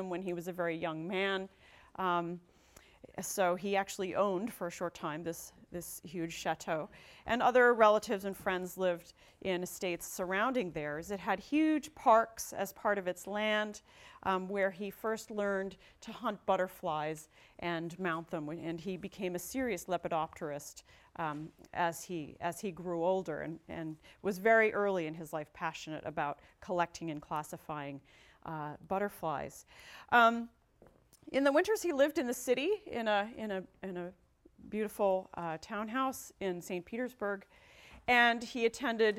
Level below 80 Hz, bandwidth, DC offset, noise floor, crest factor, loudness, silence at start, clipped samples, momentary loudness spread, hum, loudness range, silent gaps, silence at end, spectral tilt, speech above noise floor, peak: -68 dBFS; 16.5 kHz; under 0.1%; -64 dBFS; 22 dB; -34 LUFS; 0 s; under 0.1%; 15 LU; none; 7 LU; none; 0 s; -4.5 dB/octave; 30 dB; -12 dBFS